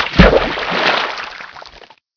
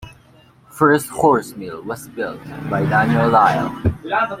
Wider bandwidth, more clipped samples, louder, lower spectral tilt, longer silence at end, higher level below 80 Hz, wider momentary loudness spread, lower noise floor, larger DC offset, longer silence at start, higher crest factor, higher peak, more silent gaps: second, 5.4 kHz vs 16 kHz; first, 0.3% vs under 0.1%; first, -14 LUFS vs -17 LUFS; about the same, -6 dB/octave vs -6.5 dB/octave; first, 0.4 s vs 0 s; first, -24 dBFS vs -44 dBFS; first, 22 LU vs 15 LU; second, -42 dBFS vs -50 dBFS; neither; about the same, 0 s vs 0 s; about the same, 16 dB vs 16 dB; about the same, 0 dBFS vs -2 dBFS; neither